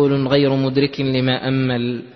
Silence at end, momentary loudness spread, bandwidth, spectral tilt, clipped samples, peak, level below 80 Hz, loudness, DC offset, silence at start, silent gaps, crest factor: 0.05 s; 4 LU; 6.2 kHz; -8.5 dB/octave; under 0.1%; -2 dBFS; -52 dBFS; -18 LUFS; under 0.1%; 0 s; none; 16 dB